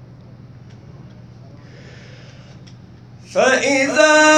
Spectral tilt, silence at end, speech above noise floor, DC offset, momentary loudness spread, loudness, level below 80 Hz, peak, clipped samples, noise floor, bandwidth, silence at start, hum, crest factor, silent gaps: -2.5 dB/octave; 0 s; 28 dB; under 0.1%; 28 LU; -14 LUFS; -56 dBFS; 0 dBFS; under 0.1%; -41 dBFS; 10.5 kHz; 0.45 s; none; 18 dB; none